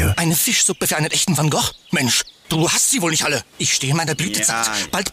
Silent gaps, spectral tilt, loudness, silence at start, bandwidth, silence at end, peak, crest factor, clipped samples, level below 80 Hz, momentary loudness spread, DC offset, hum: none; -2.5 dB/octave; -17 LUFS; 0 s; 16 kHz; 0 s; -8 dBFS; 12 dB; under 0.1%; -44 dBFS; 5 LU; under 0.1%; none